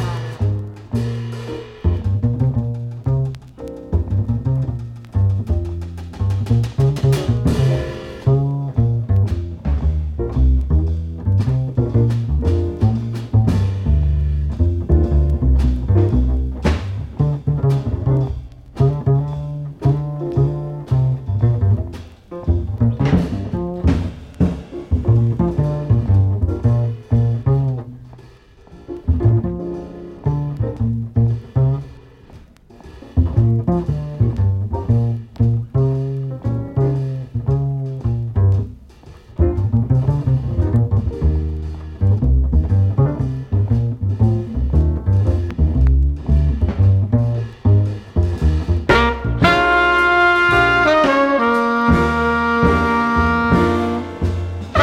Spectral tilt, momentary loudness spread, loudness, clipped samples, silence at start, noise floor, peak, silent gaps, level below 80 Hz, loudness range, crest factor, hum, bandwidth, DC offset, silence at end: -8 dB/octave; 9 LU; -18 LUFS; under 0.1%; 0 s; -44 dBFS; 0 dBFS; none; -24 dBFS; 7 LU; 16 dB; none; 8.8 kHz; under 0.1%; 0 s